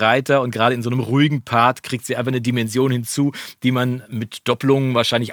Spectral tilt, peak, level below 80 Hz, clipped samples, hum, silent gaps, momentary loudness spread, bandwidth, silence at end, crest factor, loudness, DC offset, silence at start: -5.5 dB/octave; -2 dBFS; -64 dBFS; under 0.1%; none; none; 7 LU; over 20 kHz; 0 s; 18 dB; -19 LUFS; under 0.1%; 0 s